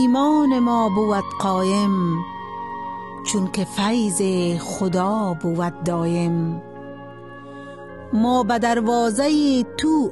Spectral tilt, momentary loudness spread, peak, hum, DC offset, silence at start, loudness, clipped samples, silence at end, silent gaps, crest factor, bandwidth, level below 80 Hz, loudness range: -5.5 dB/octave; 19 LU; -8 dBFS; none; 0.3%; 0 s; -21 LUFS; under 0.1%; 0 s; none; 12 dB; 12.5 kHz; -58 dBFS; 3 LU